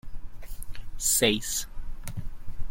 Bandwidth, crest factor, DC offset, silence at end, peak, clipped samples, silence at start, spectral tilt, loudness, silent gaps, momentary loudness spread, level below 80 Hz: 16.5 kHz; 22 dB; under 0.1%; 0 s; -6 dBFS; under 0.1%; 0.05 s; -2 dB/octave; -25 LUFS; none; 24 LU; -36 dBFS